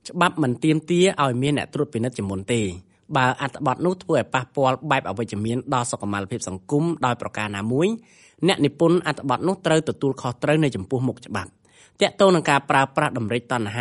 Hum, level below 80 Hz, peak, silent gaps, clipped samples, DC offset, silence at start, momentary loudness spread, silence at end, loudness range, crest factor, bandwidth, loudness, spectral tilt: none; -58 dBFS; -4 dBFS; none; under 0.1%; under 0.1%; 0.05 s; 8 LU; 0 s; 3 LU; 18 dB; 11.5 kHz; -22 LUFS; -5.5 dB/octave